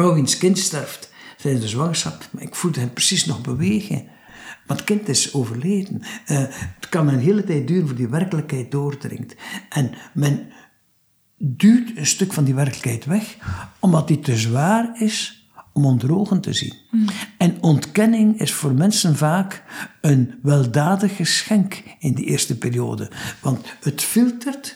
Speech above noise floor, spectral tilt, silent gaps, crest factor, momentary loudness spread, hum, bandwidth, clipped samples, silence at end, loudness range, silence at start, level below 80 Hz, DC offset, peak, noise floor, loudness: 40 dB; -5 dB/octave; none; 16 dB; 12 LU; none; over 20 kHz; under 0.1%; 0 s; 4 LU; 0 s; -58 dBFS; under 0.1%; -4 dBFS; -59 dBFS; -20 LUFS